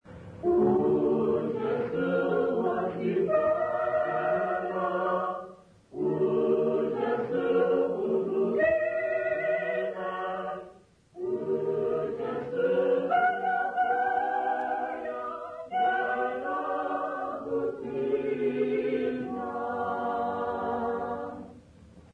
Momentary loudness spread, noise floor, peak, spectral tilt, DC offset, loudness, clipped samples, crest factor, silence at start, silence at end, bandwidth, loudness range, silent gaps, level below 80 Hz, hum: 9 LU; -55 dBFS; -16 dBFS; -8 dB/octave; under 0.1%; -29 LUFS; under 0.1%; 12 dB; 0.05 s; 0.15 s; 6 kHz; 4 LU; none; -62 dBFS; none